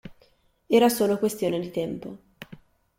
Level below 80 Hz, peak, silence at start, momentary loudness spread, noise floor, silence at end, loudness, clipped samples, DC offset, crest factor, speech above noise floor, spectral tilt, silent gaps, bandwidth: -62 dBFS; -8 dBFS; 0.05 s; 25 LU; -62 dBFS; 0.45 s; -24 LUFS; under 0.1%; under 0.1%; 18 dB; 39 dB; -5 dB/octave; none; 16.5 kHz